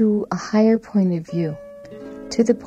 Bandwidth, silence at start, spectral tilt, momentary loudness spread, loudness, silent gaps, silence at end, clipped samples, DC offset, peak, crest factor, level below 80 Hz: 8.8 kHz; 0 s; -7 dB/octave; 19 LU; -20 LUFS; none; 0 s; under 0.1%; under 0.1%; -4 dBFS; 16 dB; -56 dBFS